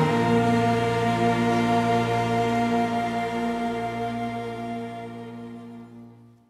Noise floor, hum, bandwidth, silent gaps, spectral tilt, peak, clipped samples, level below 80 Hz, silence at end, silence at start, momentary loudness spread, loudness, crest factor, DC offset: -48 dBFS; 60 Hz at -65 dBFS; 13.5 kHz; none; -6.5 dB/octave; -10 dBFS; under 0.1%; -54 dBFS; 0.35 s; 0 s; 17 LU; -24 LUFS; 14 dB; under 0.1%